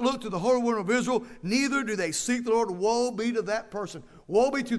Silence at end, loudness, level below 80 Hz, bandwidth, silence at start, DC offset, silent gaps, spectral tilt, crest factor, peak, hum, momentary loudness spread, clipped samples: 0 s; -27 LUFS; -58 dBFS; 11 kHz; 0 s; under 0.1%; none; -4 dB/octave; 16 dB; -12 dBFS; none; 7 LU; under 0.1%